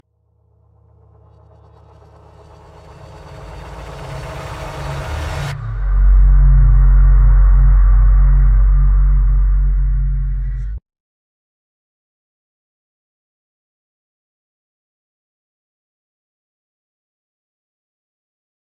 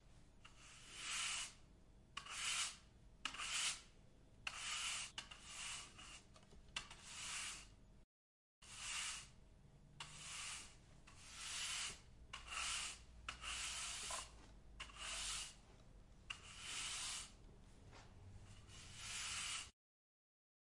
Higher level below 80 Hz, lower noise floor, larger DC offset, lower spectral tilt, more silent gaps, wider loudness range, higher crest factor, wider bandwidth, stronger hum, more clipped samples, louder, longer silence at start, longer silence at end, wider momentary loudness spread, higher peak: first, -16 dBFS vs -66 dBFS; second, -59 dBFS vs under -90 dBFS; neither; first, -7.5 dB/octave vs 0.5 dB/octave; second, none vs 8.04-8.62 s; first, 19 LU vs 6 LU; second, 14 dB vs 22 dB; second, 4.6 kHz vs 11.5 kHz; neither; neither; first, -16 LUFS vs -47 LUFS; first, 3.25 s vs 0 s; first, 7.9 s vs 1 s; about the same, 20 LU vs 21 LU; first, -2 dBFS vs -28 dBFS